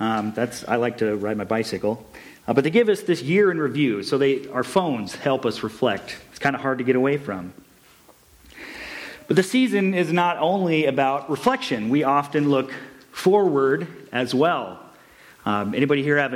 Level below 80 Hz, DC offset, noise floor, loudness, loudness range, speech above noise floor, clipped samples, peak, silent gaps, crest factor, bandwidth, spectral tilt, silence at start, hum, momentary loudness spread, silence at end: -62 dBFS; under 0.1%; -53 dBFS; -22 LUFS; 4 LU; 31 dB; under 0.1%; -6 dBFS; none; 16 dB; 16 kHz; -6 dB/octave; 0 s; none; 14 LU; 0 s